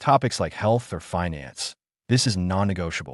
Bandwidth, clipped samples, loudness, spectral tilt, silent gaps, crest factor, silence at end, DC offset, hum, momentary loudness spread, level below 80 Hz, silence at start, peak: 12 kHz; under 0.1%; -25 LUFS; -5 dB/octave; none; 18 dB; 0 s; under 0.1%; none; 10 LU; -52 dBFS; 0 s; -6 dBFS